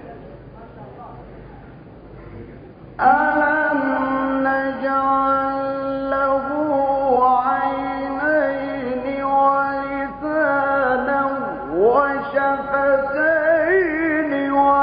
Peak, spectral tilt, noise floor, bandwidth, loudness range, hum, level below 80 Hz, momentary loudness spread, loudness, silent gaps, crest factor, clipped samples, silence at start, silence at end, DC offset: -4 dBFS; -10.5 dB/octave; -40 dBFS; 5.2 kHz; 3 LU; none; -48 dBFS; 22 LU; -19 LUFS; none; 16 dB; under 0.1%; 0 s; 0 s; under 0.1%